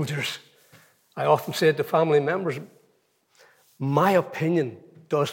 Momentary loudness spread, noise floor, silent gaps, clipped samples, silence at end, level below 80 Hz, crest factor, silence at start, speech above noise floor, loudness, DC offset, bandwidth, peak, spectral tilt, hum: 12 LU; -67 dBFS; none; under 0.1%; 0 s; -82 dBFS; 20 dB; 0 s; 44 dB; -24 LUFS; under 0.1%; 17 kHz; -6 dBFS; -6 dB/octave; none